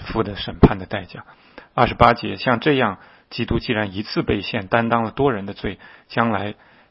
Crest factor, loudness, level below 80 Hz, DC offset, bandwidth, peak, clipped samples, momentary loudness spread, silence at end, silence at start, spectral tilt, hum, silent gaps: 20 dB; -20 LUFS; -36 dBFS; under 0.1%; 5.8 kHz; 0 dBFS; under 0.1%; 14 LU; 0.4 s; 0 s; -9 dB/octave; none; none